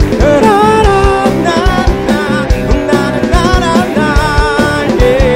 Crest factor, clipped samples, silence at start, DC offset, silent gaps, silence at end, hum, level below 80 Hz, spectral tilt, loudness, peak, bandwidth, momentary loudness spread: 8 dB; 0.7%; 0 s; under 0.1%; none; 0 s; none; -16 dBFS; -6 dB/octave; -10 LUFS; 0 dBFS; 16 kHz; 5 LU